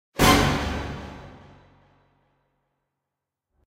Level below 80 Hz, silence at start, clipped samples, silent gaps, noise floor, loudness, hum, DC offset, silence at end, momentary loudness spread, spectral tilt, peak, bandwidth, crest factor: -38 dBFS; 0.15 s; under 0.1%; none; -85 dBFS; -21 LUFS; none; under 0.1%; 2.35 s; 23 LU; -4 dB/octave; -4 dBFS; 16 kHz; 24 dB